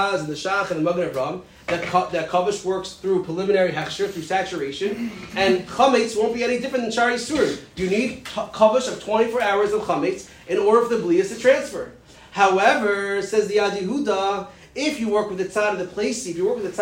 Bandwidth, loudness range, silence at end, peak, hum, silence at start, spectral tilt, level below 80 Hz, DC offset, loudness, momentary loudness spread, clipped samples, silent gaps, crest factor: 16 kHz; 3 LU; 0 s; -4 dBFS; none; 0 s; -4.5 dB/octave; -54 dBFS; under 0.1%; -22 LUFS; 9 LU; under 0.1%; none; 18 dB